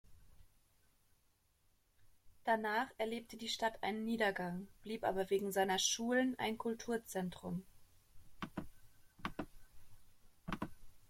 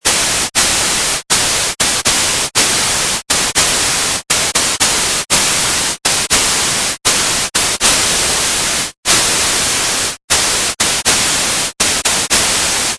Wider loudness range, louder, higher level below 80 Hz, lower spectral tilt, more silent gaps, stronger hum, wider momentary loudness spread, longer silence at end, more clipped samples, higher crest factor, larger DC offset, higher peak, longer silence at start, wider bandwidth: first, 12 LU vs 0 LU; second, -39 LUFS vs -11 LUFS; second, -64 dBFS vs -36 dBFS; first, -3.5 dB/octave vs 0 dB/octave; second, none vs 8.97-9.03 s, 10.24-10.28 s; neither; first, 14 LU vs 3 LU; about the same, 0.05 s vs 0 s; neither; first, 20 dB vs 14 dB; neither; second, -22 dBFS vs 0 dBFS; about the same, 0.1 s vs 0.05 s; first, 16.5 kHz vs 11 kHz